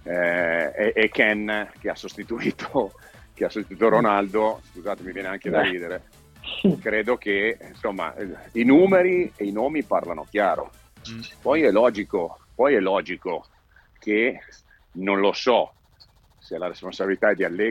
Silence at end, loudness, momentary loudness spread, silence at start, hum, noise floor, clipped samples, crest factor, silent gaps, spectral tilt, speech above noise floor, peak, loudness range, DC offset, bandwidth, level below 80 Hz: 0 s; -23 LUFS; 14 LU; 0.05 s; none; -56 dBFS; under 0.1%; 20 dB; none; -6 dB/octave; 34 dB; -2 dBFS; 4 LU; under 0.1%; 15.5 kHz; -54 dBFS